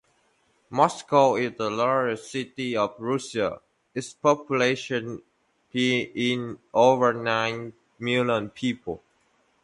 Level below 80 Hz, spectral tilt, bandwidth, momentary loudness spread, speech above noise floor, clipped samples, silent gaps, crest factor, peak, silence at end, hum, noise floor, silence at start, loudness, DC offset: -64 dBFS; -5 dB/octave; 11.5 kHz; 15 LU; 42 dB; under 0.1%; none; 20 dB; -4 dBFS; 0.65 s; none; -66 dBFS; 0.7 s; -25 LUFS; under 0.1%